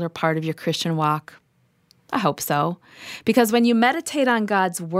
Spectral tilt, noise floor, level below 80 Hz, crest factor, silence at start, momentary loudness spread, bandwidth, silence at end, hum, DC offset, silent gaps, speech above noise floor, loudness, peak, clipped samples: -5 dB/octave; -64 dBFS; -68 dBFS; 20 dB; 0 s; 10 LU; 16 kHz; 0 s; none; under 0.1%; none; 43 dB; -21 LUFS; -2 dBFS; under 0.1%